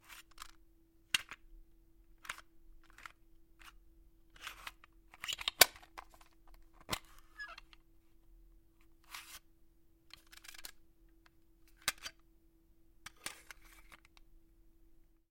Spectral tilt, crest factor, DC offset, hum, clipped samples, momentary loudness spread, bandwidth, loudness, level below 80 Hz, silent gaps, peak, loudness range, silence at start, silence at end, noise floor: 0.5 dB/octave; 42 dB; under 0.1%; none; under 0.1%; 23 LU; 16.5 kHz; -37 LUFS; -64 dBFS; none; -4 dBFS; 20 LU; 0.1 s; 0.4 s; -67 dBFS